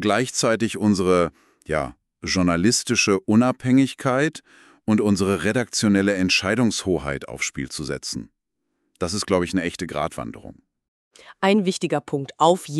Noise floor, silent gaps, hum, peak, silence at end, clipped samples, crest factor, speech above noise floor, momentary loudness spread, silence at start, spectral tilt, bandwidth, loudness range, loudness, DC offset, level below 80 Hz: -77 dBFS; 10.88-11.11 s; none; -4 dBFS; 0 s; under 0.1%; 18 dB; 55 dB; 11 LU; 0 s; -4.5 dB/octave; 13 kHz; 7 LU; -21 LUFS; under 0.1%; -50 dBFS